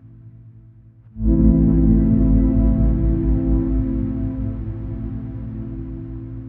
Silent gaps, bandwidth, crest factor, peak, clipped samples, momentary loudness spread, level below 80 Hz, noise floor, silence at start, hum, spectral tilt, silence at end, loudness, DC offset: none; 2.3 kHz; 16 dB; -2 dBFS; under 0.1%; 15 LU; -22 dBFS; -46 dBFS; 0.05 s; none; -14 dB/octave; 0 s; -19 LUFS; under 0.1%